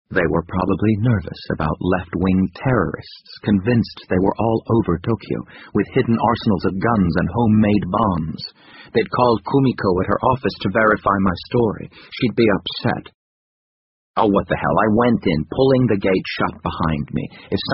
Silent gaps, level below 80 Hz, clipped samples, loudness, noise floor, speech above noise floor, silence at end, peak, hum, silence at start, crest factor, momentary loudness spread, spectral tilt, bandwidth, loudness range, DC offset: 13.15-14.14 s; -40 dBFS; under 0.1%; -19 LUFS; under -90 dBFS; over 72 dB; 0 s; -2 dBFS; none; 0.1 s; 18 dB; 9 LU; -6 dB/octave; 5.8 kHz; 2 LU; under 0.1%